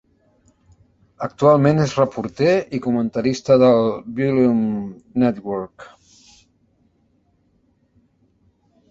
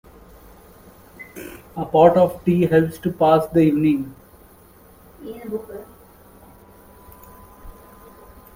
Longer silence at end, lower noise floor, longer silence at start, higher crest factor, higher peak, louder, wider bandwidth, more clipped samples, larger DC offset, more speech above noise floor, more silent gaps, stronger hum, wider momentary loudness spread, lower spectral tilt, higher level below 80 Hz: first, 3.05 s vs 0.85 s; first, -62 dBFS vs -49 dBFS; about the same, 1.2 s vs 1.2 s; about the same, 20 dB vs 22 dB; about the same, -2 dBFS vs 0 dBFS; about the same, -18 LUFS vs -18 LUFS; second, 7.8 kHz vs 16.5 kHz; neither; neither; first, 44 dB vs 31 dB; neither; neither; second, 14 LU vs 24 LU; about the same, -7.5 dB/octave vs -8 dB/octave; second, -56 dBFS vs -50 dBFS